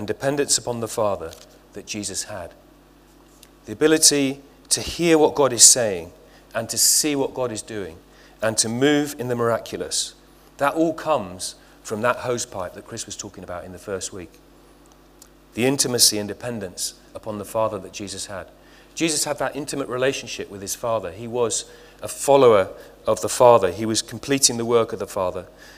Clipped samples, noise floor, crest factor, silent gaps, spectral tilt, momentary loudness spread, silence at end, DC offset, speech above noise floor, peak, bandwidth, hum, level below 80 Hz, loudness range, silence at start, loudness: under 0.1%; -51 dBFS; 22 dB; none; -2.5 dB/octave; 18 LU; 0.05 s; under 0.1%; 29 dB; 0 dBFS; 16 kHz; none; -54 dBFS; 11 LU; 0 s; -20 LUFS